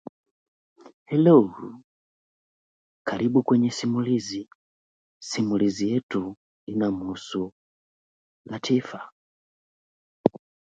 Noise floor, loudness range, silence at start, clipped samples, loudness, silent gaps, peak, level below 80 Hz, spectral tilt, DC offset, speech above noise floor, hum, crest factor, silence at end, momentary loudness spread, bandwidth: under -90 dBFS; 8 LU; 0.85 s; under 0.1%; -24 LUFS; 0.94-1.06 s, 1.84-3.05 s, 4.55-5.21 s, 6.03-6.09 s, 6.37-6.67 s, 7.52-8.45 s, 9.12-10.24 s; 0 dBFS; -64 dBFS; -6.5 dB/octave; under 0.1%; over 67 dB; none; 26 dB; 0.5 s; 19 LU; 8.8 kHz